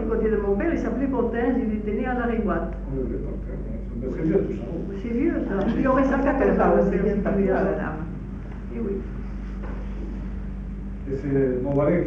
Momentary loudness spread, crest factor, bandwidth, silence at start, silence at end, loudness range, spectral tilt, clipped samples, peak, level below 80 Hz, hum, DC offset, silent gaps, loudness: 13 LU; 16 dB; 6.8 kHz; 0 s; 0 s; 8 LU; -9.5 dB/octave; under 0.1%; -8 dBFS; -34 dBFS; none; under 0.1%; none; -25 LUFS